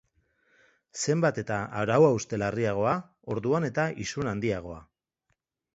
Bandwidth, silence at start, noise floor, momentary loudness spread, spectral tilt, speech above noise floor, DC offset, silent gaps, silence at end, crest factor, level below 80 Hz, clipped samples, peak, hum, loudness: 8 kHz; 0.95 s; -78 dBFS; 13 LU; -5.5 dB/octave; 51 dB; under 0.1%; none; 0.9 s; 20 dB; -58 dBFS; under 0.1%; -8 dBFS; none; -28 LUFS